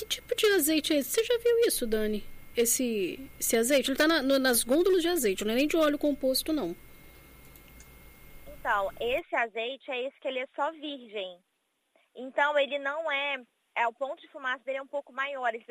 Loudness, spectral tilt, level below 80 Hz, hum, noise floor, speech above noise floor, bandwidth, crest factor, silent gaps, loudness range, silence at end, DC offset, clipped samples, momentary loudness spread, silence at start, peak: -28 LUFS; -2 dB/octave; -52 dBFS; none; -74 dBFS; 46 dB; 15.5 kHz; 16 dB; none; 8 LU; 0.1 s; under 0.1%; under 0.1%; 13 LU; 0 s; -14 dBFS